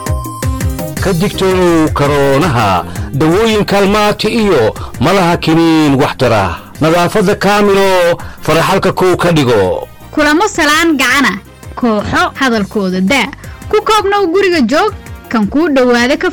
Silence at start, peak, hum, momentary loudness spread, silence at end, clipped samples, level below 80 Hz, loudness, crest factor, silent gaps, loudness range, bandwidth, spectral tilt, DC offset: 0 s; -4 dBFS; none; 8 LU; 0 s; under 0.1%; -30 dBFS; -11 LUFS; 6 dB; none; 2 LU; 19 kHz; -5 dB/octave; under 0.1%